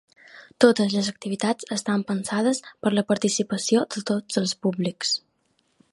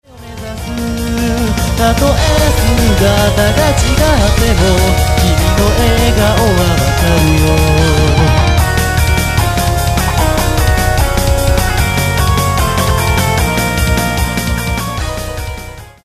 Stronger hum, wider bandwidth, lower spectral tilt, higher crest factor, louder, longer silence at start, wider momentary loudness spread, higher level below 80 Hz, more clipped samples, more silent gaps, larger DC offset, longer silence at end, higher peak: neither; second, 11.5 kHz vs 15.5 kHz; about the same, -4.5 dB/octave vs -5 dB/octave; first, 22 dB vs 10 dB; second, -24 LUFS vs -12 LUFS; first, 0.35 s vs 0.15 s; about the same, 7 LU vs 8 LU; second, -68 dBFS vs -16 dBFS; neither; neither; neither; first, 0.75 s vs 0.15 s; about the same, -2 dBFS vs 0 dBFS